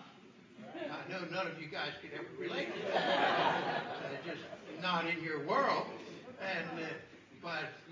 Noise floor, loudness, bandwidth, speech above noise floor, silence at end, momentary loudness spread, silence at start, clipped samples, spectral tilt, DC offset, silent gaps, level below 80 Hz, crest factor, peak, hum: -58 dBFS; -37 LUFS; 7.6 kHz; 21 dB; 0 s; 16 LU; 0 s; under 0.1%; -5 dB/octave; under 0.1%; none; -80 dBFS; 18 dB; -20 dBFS; none